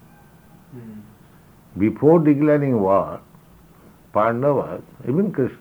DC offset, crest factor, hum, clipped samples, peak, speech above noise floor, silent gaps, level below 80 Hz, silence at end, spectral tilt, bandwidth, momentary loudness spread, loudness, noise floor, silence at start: under 0.1%; 18 dB; none; under 0.1%; -2 dBFS; 30 dB; none; -58 dBFS; 0.05 s; -10 dB/octave; over 20 kHz; 23 LU; -19 LUFS; -49 dBFS; 0.75 s